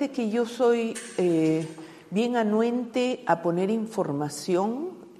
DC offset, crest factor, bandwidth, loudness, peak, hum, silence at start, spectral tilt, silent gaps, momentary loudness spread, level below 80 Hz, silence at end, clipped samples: under 0.1%; 18 dB; 13.5 kHz; -26 LUFS; -8 dBFS; none; 0 s; -6 dB/octave; none; 7 LU; -74 dBFS; 0.05 s; under 0.1%